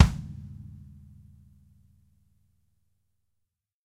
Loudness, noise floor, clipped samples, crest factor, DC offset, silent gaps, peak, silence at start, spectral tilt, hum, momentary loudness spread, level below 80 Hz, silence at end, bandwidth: -31 LUFS; -82 dBFS; under 0.1%; 30 dB; under 0.1%; none; -2 dBFS; 0 s; -6 dB/octave; none; 21 LU; -40 dBFS; 3.45 s; 14 kHz